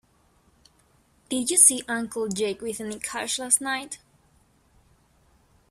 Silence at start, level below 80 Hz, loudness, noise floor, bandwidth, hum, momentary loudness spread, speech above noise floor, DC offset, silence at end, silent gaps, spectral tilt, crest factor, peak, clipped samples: 1.3 s; -64 dBFS; -23 LUFS; -63 dBFS; 15.5 kHz; none; 16 LU; 38 dB; under 0.1%; 1.75 s; none; -1 dB/octave; 26 dB; -2 dBFS; under 0.1%